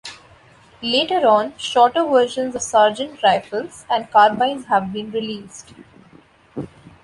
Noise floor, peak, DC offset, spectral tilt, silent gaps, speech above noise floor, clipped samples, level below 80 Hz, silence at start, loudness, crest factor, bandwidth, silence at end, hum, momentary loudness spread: -50 dBFS; -2 dBFS; under 0.1%; -3.5 dB/octave; none; 32 dB; under 0.1%; -58 dBFS; 0.05 s; -18 LUFS; 18 dB; 11.5 kHz; 0.35 s; none; 19 LU